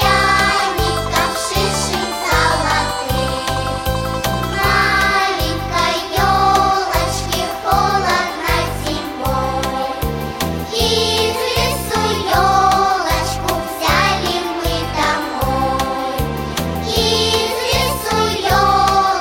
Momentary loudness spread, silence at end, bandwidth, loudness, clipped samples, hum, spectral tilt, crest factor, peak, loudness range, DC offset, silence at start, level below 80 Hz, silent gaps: 7 LU; 0 s; 17 kHz; -16 LUFS; under 0.1%; none; -3.5 dB/octave; 16 dB; 0 dBFS; 3 LU; under 0.1%; 0 s; -28 dBFS; none